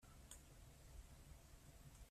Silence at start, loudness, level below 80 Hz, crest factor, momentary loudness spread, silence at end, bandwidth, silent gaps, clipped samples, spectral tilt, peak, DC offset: 0 s; -64 LUFS; -64 dBFS; 20 dB; 3 LU; 0 s; 15.5 kHz; none; under 0.1%; -4 dB/octave; -42 dBFS; under 0.1%